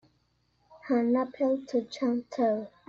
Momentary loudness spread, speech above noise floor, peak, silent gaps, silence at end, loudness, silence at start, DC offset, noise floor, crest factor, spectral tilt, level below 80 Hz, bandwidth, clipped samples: 4 LU; 43 dB; -16 dBFS; none; 0.2 s; -29 LUFS; 0.7 s; under 0.1%; -71 dBFS; 14 dB; -6 dB/octave; -72 dBFS; 7.4 kHz; under 0.1%